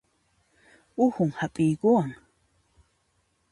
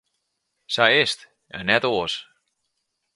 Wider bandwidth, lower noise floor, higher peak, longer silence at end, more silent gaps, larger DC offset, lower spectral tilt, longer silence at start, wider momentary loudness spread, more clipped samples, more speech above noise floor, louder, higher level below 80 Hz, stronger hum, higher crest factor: about the same, 11.5 kHz vs 11.5 kHz; second, -71 dBFS vs -76 dBFS; second, -10 dBFS vs 0 dBFS; first, 1.35 s vs 0.9 s; neither; neither; first, -8 dB/octave vs -3 dB/octave; first, 1 s vs 0.7 s; second, 10 LU vs 15 LU; neither; second, 47 dB vs 55 dB; second, -25 LUFS vs -21 LUFS; about the same, -64 dBFS vs -60 dBFS; neither; about the same, 20 dB vs 24 dB